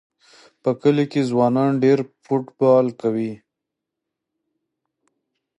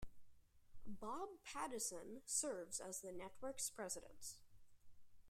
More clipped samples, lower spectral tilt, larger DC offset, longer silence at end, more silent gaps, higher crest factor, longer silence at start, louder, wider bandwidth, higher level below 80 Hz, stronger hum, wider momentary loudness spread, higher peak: neither; first, -8 dB/octave vs -2 dB/octave; neither; first, 2.25 s vs 0 s; neither; about the same, 18 dB vs 22 dB; first, 0.65 s vs 0 s; first, -20 LUFS vs -48 LUFS; second, 10 kHz vs 16 kHz; about the same, -68 dBFS vs -70 dBFS; neither; second, 8 LU vs 13 LU; first, -4 dBFS vs -28 dBFS